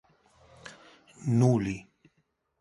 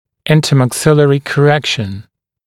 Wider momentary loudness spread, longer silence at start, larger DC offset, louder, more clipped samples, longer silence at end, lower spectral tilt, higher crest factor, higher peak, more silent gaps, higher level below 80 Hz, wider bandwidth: first, 25 LU vs 9 LU; first, 0.65 s vs 0.25 s; neither; second, -28 LUFS vs -12 LUFS; neither; first, 0.8 s vs 0.45 s; first, -8 dB/octave vs -5.5 dB/octave; first, 20 dB vs 12 dB; second, -10 dBFS vs 0 dBFS; neither; second, -60 dBFS vs -48 dBFS; second, 11.5 kHz vs 14 kHz